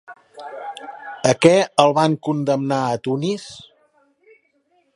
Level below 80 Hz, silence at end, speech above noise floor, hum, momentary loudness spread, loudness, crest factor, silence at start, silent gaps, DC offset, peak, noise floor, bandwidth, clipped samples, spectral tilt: -64 dBFS; 1.35 s; 46 dB; none; 21 LU; -18 LUFS; 20 dB; 0.1 s; none; under 0.1%; 0 dBFS; -63 dBFS; 11.5 kHz; under 0.1%; -5.5 dB/octave